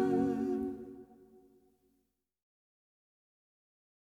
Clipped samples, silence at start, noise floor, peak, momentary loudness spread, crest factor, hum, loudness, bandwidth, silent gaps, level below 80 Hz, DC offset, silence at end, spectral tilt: under 0.1%; 0 s; -80 dBFS; -20 dBFS; 20 LU; 20 dB; 60 Hz at -90 dBFS; -35 LUFS; 8.8 kHz; none; -68 dBFS; under 0.1%; 3 s; -8.5 dB/octave